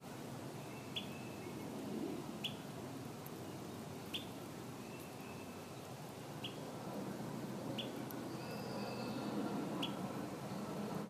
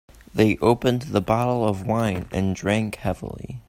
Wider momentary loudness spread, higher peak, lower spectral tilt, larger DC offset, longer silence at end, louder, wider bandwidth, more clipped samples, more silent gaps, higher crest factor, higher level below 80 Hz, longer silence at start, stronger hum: about the same, 7 LU vs 9 LU; second, -28 dBFS vs -4 dBFS; second, -5 dB/octave vs -6.5 dB/octave; neither; about the same, 0 s vs 0.1 s; second, -46 LUFS vs -23 LUFS; about the same, 15.5 kHz vs 16 kHz; neither; neither; about the same, 18 dB vs 20 dB; second, -74 dBFS vs -46 dBFS; second, 0 s vs 0.35 s; neither